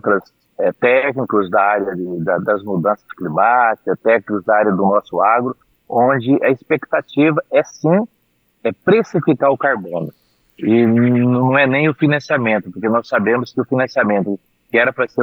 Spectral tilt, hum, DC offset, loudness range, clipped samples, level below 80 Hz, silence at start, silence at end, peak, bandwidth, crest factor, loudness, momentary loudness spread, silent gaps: -8 dB/octave; none; under 0.1%; 2 LU; under 0.1%; -64 dBFS; 0.05 s; 0 s; -2 dBFS; 6.6 kHz; 14 dB; -16 LUFS; 9 LU; none